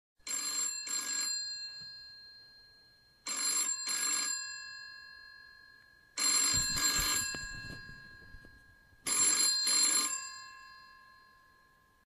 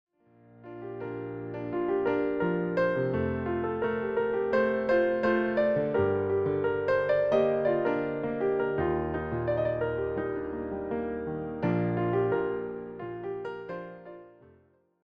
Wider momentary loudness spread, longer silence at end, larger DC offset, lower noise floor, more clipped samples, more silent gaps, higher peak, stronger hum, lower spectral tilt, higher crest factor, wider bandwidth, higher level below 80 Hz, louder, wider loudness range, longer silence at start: first, 24 LU vs 12 LU; first, 1.1 s vs 0.75 s; neither; about the same, -66 dBFS vs -64 dBFS; neither; neither; second, -18 dBFS vs -14 dBFS; neither; second, 1 dB/octave vs -9.5 dB/octave; about the same, 18 dB vs 16 dB; first, 15.5 kHz vs 6.2 kHz; about the same, -58 dBFS vs -54 dBFS; about the same, -30 LUFS vs -29 LUFS; about the same, 5 LU vs 5 LU; second, 0.25 s vs 0.55 s